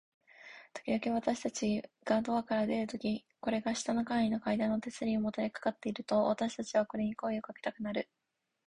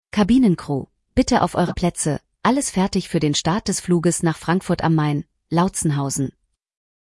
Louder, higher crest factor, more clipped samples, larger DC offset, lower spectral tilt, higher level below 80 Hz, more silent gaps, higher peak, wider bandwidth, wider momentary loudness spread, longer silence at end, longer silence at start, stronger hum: second, -34 LUFS vs -20 LUFS; about the same, 18 dB vs 16 dB; neither; neither; about the same, -5 dB/octave vs -5.5 dB/octave; second, -68 dBFS vs -42 dBFS; neither; second, -16 dBFS vs -4 dBFS; about the same, 11 kHz vs 12 kHz; about the same, 8 LU vs 7 LU; about the same, 0.65 s vs 0.75 s; first, 0.4 s vs 0.15 s; neither